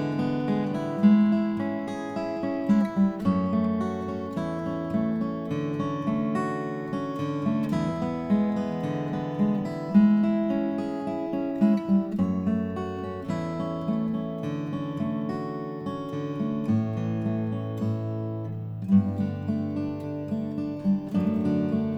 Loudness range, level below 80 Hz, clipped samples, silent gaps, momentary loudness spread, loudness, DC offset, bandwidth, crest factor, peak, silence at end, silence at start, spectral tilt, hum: 5 LU; -58 dBFS; under 0.1%; none; 9 LU; -27 LUFS; under 0.1%; 7.8 kHz; 18 dB; -8 dBFS; 0 s; 0 s; -9 dB/octave; none